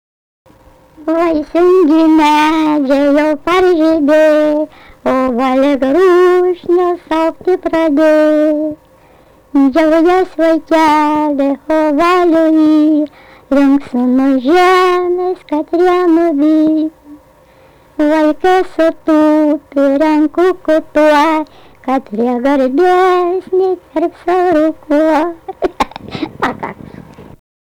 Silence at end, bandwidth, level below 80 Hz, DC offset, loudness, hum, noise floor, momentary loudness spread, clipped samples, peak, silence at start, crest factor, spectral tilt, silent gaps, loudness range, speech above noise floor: 0.5 s; 12.5 kHz; -44 dBFS; under 0.1%; -11 LUFS; none; -45 dBFS; 9 LU; under 0.1%; -4 dBFS; 1 s; 8 dB; -5 dB/octave; none; 3 LU; 34 dB